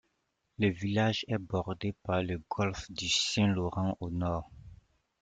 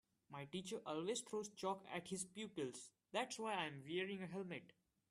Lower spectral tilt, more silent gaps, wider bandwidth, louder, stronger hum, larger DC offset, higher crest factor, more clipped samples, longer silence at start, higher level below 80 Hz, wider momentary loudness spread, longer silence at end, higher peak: first, -5 dB/octave vs -3.5 dB/octave; neither; second, 9.4 kHz vs 13.5 kHz; first, -32 LUFS vs -47 LUFS; neither; neither; about the same, 16 dB vs 20 dB; neither; first, 0.6 s vs 0.3 s; first, -56 dBFS vs -86 dBFS; about the same, 8 LU vs 7 LU; about the same, 0.45 s vs 0.4 s; first, -16 dBFS vs -28 dBFS